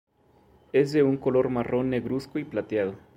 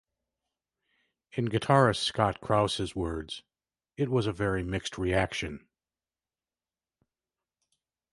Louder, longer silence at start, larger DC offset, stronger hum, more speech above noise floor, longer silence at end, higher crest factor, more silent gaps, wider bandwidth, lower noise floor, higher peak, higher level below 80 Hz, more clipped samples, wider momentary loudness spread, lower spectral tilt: first, -26 LUFS vs -29 LUFS; second, 0.75 s vs 1.35 s; neither; neither; second, 34 dB vs over 62 dB; second, 0.2 s vs 2.55 s; second, 16 dB vs 24 dB; neither; about the same, 10.5 kHz vs 11.5 kHz; second, -60 dBFS vs under -90 dBFS; about the same, -10 dBFS vs -8 dBFS; second, -58 dBFS vs -50 dBFS; neither; second, 8 LU vs 15 LU; first, -8 dB/octave vs -5.5 dB/octave